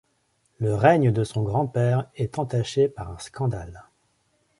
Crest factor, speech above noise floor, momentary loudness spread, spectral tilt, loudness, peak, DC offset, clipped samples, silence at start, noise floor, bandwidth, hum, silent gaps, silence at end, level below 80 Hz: 22 dB; 46 dB; 15 LU; -7 dB/octave; -24 LUFS; -2 dBFS; under 0.1%; under 0.1%; 0.6 s; -69 dBFS; 11.5 kHz; none; none; 0.75 s; -50 dBFS